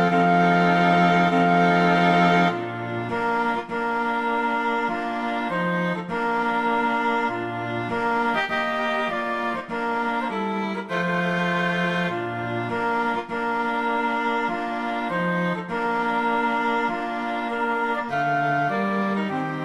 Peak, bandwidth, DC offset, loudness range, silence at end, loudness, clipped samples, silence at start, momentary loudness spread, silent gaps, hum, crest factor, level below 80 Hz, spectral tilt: -4 dBFS; 11 kHz; under 0.1%; 5 LU; 0 s; -23 LUFS; under 0.1%; 0 s; 9 LU; none; none; 18 dB; -58 dBFS; -6.5 dB/octave